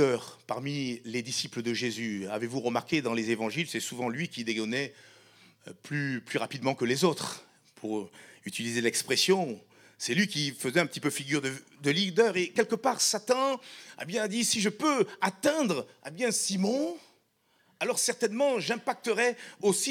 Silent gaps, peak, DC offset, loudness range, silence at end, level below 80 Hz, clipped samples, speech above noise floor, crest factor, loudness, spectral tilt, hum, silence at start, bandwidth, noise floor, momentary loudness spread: none; -10 dBFS; under 0.1%; 5 LU; 0 s; -80 dBFS; under 0.1%; 40 dB; 20 dB; -29 LUFS; -3.5 dB/octave; none; 0 s; 18 kHz; -69 dBFS; 10 LU